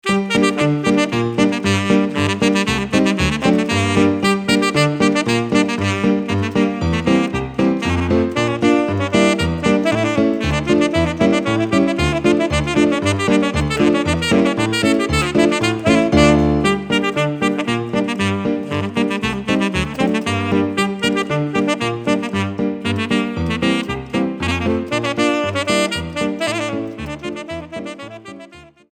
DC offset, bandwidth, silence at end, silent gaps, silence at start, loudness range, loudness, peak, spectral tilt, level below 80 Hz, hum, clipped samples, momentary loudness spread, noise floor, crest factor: under 0.1%; 15.5 kHz; 0.3 s; none; 0.05 s; 4 LU; -17 LUFS; 0 dBFS; -5.5 dB/octave; -36 dBFS; none; under 0.1%; 6 LU; -41 dBFS; 16 dB